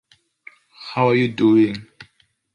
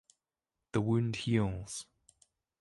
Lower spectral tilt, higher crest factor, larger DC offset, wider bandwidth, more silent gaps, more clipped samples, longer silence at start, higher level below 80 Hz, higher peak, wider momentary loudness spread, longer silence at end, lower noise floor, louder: first, -8 dB/octave vs -6 dB/octave; about the same, 16 dB vs 18 dB; neither; second, 7 kHz vs 11.5 kHz; neither; neither; about the same, 0.8 s vs 0.75 s; about the same, -60 dBFS vs -58 dBFS; first, -4 dBFS vs -18 dBFS; first, 18 LU vs 12 LU; second, 0.5 s vs 0.8 s; second, -60 dBFS vs under -90 dBFS; first, -18 LUFS vs -34 LUFS